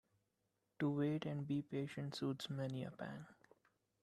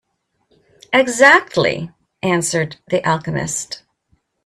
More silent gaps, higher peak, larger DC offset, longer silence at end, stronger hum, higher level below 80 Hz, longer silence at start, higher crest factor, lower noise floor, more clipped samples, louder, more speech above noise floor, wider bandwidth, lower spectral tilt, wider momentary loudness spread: neither; second, -28 dBFS vs 0 dBFS; neither; about the same, 0.7 s vs 0.7 s; neither; second, -80 dBFS vs -56 dBFS; about the same, 0.8 s vs 0.9 s; about the same, 16 dB vs 18 dB; first, -86 dBFS vs -67 dBFS; neither; second, -43 LUFS vs -16 LUFS; second, 43 dB vs 51 dB; second, 12.5 kHz vs 14 kHz; first, -7 dB/octave vs -3.5 dB/octave; second, 11 LU vs 17 LU